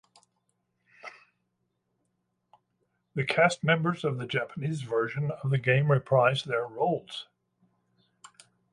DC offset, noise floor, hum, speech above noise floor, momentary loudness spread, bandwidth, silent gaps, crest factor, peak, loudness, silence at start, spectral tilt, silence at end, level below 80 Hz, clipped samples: under 0.1%; -78 dBFS; none; 51 dB; 17 LU; 11 kHz; none; 22 dB; -8 dBFS; -27 LUFS; 1.05 s; -6 dB/octave; 1.5 s; -70 dBFS; under 0.1%